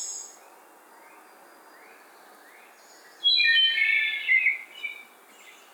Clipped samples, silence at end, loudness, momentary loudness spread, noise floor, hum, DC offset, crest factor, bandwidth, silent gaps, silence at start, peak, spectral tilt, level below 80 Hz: under 0.1%; 0.25 s; -21 LUFS; 19 LU; -53 dBFS; none; under 0.1%; 18 dB; over 20 kHz; none; 0 s; -12 dBFS; 4.5 dB/octave; under -90 dBFS